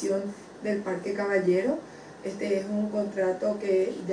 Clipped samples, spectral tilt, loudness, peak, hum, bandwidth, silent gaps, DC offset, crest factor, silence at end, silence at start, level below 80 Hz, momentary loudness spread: under 0.1%; -6.5 dB/octave; -28 LUFS; -14 dBFS; none; 10.5 kHz; none; under 0.1%; 14 dB; 0 s; 0 s; -68 dBFS; 11 LU